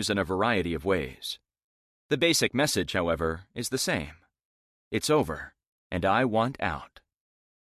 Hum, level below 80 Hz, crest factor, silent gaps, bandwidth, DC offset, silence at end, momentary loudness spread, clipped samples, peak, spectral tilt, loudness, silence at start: none; -48 dBFS; 18 dB; 1.64-2.09 s, 4.45-4.91 s, 5.67-5.90 s; 14.5 kHz; under 0.1%; 0.75 s; 13 LU; under 0.1%; -10 dBFS; -4 dB/octave; -27 LUFS; 0 s